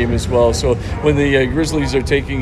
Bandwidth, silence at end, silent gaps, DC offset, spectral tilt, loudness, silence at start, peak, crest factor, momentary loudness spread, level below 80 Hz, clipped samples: 13.5 kHz; 0 s; none; under 0.1%; -5.5 dB/octave; -16 LUFS; 0 s; 0 dBFS; 14 dB; 4 LU; -26 dBFS; under 0.1%